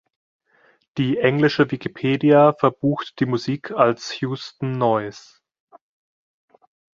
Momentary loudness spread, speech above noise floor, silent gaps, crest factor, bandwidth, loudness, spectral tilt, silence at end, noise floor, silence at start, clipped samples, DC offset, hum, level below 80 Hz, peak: 13 LU; 40 dB; none; 20 dB; 7.4 kHz; -20 LUFS; -7 dB/octave; 1.75 s; -59 dBFS; 0.95 s; under 0.1%; under 0.1%; none; -60 dBFS; -2 dBFS